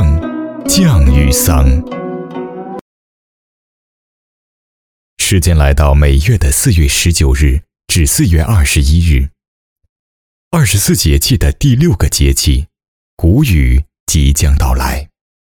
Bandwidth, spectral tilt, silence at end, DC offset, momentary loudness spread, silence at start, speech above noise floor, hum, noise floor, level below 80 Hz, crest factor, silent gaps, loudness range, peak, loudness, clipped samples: 19 kHz; -4.5 dB/octave; 0.45 s; under 0.1%; 12 LU; 0 s; over 81 dB; none; under -90 dBFS; -16 dBFS; 12 dB; 2.81-5.17 s, 9.48-9.76 s, 9.89-10.51 s, 12.88-13.17 s, 14.00-14.06 s; 7 LU; 0 dBFS; -11 LUFS; under 0.1%